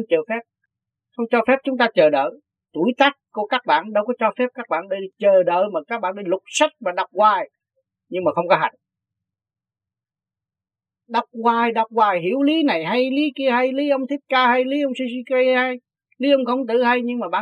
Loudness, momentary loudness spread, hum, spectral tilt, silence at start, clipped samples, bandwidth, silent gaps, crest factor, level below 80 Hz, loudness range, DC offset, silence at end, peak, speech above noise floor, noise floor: -20 LUFS; 9 LU; none; -4.5 dB/octave; 0 s; under 0.1%; 9.6 kHz; none; 20 dB; -78 dBFS; 6 LU; under 0.1%; 0 s; 0 dBFS; over 71 dB; under -90 dBFS